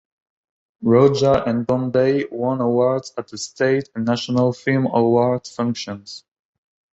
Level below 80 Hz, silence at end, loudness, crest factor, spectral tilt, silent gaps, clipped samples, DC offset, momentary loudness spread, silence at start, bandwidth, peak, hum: -52 dBFS; 0.75 s; -19 LUFS; 18 dB; -6.5 dB/octave; none; under 0.1%; under 0.1%; 15 LU; 0.8 s; 8.2 kHz; -2 dBFS; none